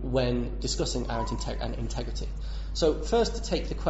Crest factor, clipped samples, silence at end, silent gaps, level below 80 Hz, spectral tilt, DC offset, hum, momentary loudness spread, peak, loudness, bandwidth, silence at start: 16 dB; under 0.1%; 0 s; none; -34 dBFS; -5 dB/octave; under 0.1%; none; 9 LU; -14 dBFS; -30 LUFS; 8 kHz; 0 s